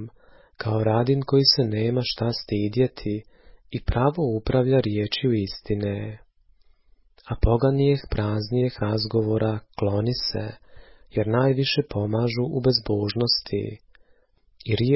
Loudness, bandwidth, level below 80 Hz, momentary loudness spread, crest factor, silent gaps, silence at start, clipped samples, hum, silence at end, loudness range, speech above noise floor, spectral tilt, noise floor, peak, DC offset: -24 LUFS; 5.8 kHz; -40 dBFS; 11 LU; 18 dB; none; 0 s; under 0.1%; none; 0 s; 3 LU; 37 dB; -9.5 dB/octave; -60 dBFS; -6 dBFS; under 0.1%